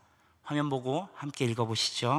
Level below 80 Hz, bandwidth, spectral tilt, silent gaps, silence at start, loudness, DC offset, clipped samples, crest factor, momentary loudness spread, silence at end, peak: -76 dBFS; 13.5 kHz; -4.5 dB/octave; none; 0.45 s; -32 LUFS; under 0.1%; under 0.1%; 18 dB; 9 LU; 0 s; -14 dBFS